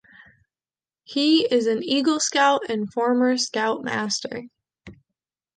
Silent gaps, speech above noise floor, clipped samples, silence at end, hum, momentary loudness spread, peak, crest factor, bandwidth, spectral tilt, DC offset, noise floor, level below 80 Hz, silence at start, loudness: none; over 68 dB; under 0.1%; 0.65 s; none; 8 LU; -6 dBFS; 18 dB; 9.8 kHz; -2.5 dB/octave; under 0.1%; under -90 dBFS; -66 dBFS; 1.1 s; -21 LUFS